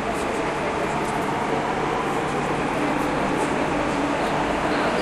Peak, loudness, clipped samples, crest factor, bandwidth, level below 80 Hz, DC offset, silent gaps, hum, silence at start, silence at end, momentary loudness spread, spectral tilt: -10 dBFS; -23 LUFS; under 0.1%; 12 dB; 14 kHz; -44 dBFS; under 0.1%; none; none; 0 s; 0 s; 2 LU; -5 dB/octave